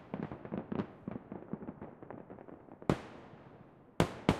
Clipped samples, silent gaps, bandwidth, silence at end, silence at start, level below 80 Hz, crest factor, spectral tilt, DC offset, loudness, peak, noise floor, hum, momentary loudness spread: under 0.1%; none; 15.5 kHz; 0 s; 0 s; -56 dBFS; 30 dB; -6.5 dB/octave; under 0.1%; -40 LUFS; -10 dBFS; -58 dBFS; none; 19 LU